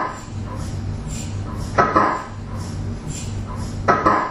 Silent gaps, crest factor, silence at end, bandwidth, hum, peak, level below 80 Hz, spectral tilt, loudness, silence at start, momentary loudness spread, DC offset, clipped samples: none; 20 dB; 0 s; 13 kHz; none; -2 dBFS; -34 dBFS; -6 dB/octave; -22 LUFS; 0 s; 13 LU; under 0.1%; under 0.1%